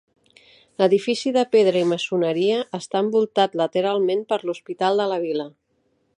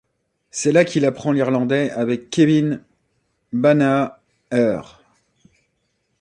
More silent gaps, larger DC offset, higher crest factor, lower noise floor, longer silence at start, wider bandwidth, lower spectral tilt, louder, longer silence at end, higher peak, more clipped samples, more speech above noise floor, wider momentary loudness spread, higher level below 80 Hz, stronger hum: neither; neither; about the same, 18 dB vs 18 dB; about the same, -68 dBFS vs -70 dBFS; first, 0.8 s vs 0.55 s; about the same, 10.5 kHz vs 10.5 kHz; about the same, -5.5 dB/octave vs -6 dB/octave; about the same, -21 LUFS vs -19 LUFS; second, 0.7 s vs 1.35 s; about the same, -4 dBFS vs -2 dBFS; neither; second, 47 dB vs 52 dB; second, 8 LU vs 11 LU; second, -76 dBFS vs -62 dBFS; neither